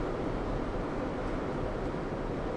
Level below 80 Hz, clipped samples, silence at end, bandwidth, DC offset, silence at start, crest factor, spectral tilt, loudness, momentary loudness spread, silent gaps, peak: -40 dBFS; under 0.1%; 0 s; 10.5 kHz; under 0.1%; 0 s; 12 dB; -7.5 dB/octave; -35 LUFS; 1 LU; none; -22 dBFS